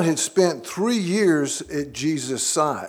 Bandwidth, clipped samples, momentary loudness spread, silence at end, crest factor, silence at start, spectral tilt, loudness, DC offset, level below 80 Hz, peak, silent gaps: 18.5 kHz; under 0.1%; 6 LU; 0 s; 16 dB; 0 s; -4 dB/octave; -22 LUFS; under 0.1%; -58 dBFS; -4 dBFS; none